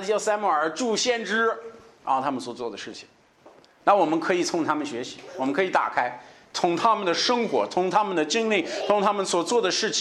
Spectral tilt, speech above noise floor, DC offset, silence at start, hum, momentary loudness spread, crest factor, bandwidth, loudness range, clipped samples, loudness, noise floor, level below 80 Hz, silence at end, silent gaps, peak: -3 dB/octave; 30 dB; under 0.1%; 0 s; none; 12 LU; 20 dB; 12.5 kHz; 3 LU; under 0.1%; -24 LUFS; -54 dBFS; -74 dBFS; 0 s; none; -6 dBFS